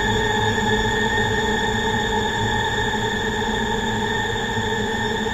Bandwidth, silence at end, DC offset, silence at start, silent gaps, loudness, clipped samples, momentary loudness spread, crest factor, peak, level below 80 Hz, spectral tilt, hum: 15.5 kHz; 0 s; under 0.1%; 0 s; none; -21 LUFS; under 0.1%; 3 LU; 14 dB; -6 dBFS; -34 dBFS; -4 dB/octave; none